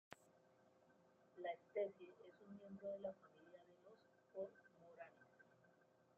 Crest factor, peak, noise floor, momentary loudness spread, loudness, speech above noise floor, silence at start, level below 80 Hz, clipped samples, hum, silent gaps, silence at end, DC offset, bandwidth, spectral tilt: 22 dB; -34 dBFS; -76 dBFS; 20 LU; -53 LUFS; 24 dB; 0.1 s; under -90 dBFS; under 0.1%; none; none; 0.4 s; under 0.1%; 7.4 kHz; -4.5 dB/octave